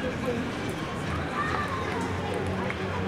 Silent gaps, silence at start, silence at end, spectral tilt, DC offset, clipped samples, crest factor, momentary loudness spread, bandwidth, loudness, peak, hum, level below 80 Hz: none; 0 s; 0 s; -6 dB/octave; under 0.1%; under 0.1%; 14 dB; 3 LU; 16 kHz; -30 LUFS; -16 dBFS; none; -46 dBFS